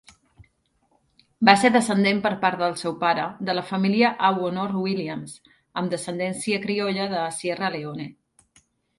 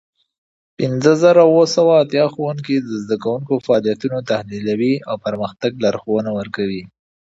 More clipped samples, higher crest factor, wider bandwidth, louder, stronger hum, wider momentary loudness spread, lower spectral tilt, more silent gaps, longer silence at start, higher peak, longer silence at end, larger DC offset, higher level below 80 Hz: neither; first, 24 dB vs 16 dB; first, 11.5 kHz vs 8 kHz; second, -23 LUFS vs -17 LUFS; neither; about the same, 14 LU vs 12 LU; about the same, -5 dB/octave vs -6 dB/octave; neither; second, 0.4 s vs 0.8 s; about the same, 0 dBFS vs 0 dBFS; first, 0.85 s vs 0.5 s; neither; second, -66 dBFS vs -58 dBFS